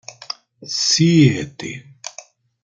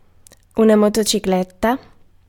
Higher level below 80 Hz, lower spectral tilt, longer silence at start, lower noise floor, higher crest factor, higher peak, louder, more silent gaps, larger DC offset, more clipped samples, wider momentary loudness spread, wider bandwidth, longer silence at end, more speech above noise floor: second, -56 dBFS vs -46 dBFS; about the same, -4.5 dB/octave vs -4.5 dB/octave; second, 0.1 s vs 0.55 s; second, -44 dBFS vs -49 dBFS; about the same, 18 dB vs 16 dB; about the same, -2 dBFS vs -2 dBFS; about the same, -15 LUFS vs -17 LUFS; neither; neither; neither; first, 21 LU vs 10 LU; second, 9.4 kHz vs 17.5 kHz; about the same, 0.55 s vs 0.5 s; second, 28 dB vs 33 dB